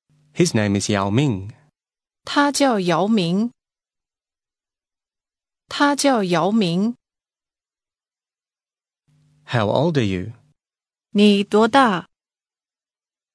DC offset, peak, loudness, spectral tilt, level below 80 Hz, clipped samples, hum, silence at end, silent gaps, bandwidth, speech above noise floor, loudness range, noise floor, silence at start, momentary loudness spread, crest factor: under 0.1%; 0 dBFS; -19 LUFS; -5 dB/octave; -62 dBFS; under 0.1%; none; 1.35 s; none; 11 kHz; over 72 dB; 6 LU; under -90 dBFS; 0.35 s; 13 LU; 20 dB